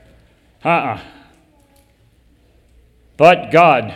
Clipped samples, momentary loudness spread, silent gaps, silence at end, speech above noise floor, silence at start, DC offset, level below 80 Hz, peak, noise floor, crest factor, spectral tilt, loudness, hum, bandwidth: 0.1%; 14 LU; none; 0 s; 41 dB; 0.65 s; under 0.1%; -52 dBFS; 0 dBFS; -53 dBFS; 18 dB; -6 dB/octave; -13 LUFS; none; 11.5 kHz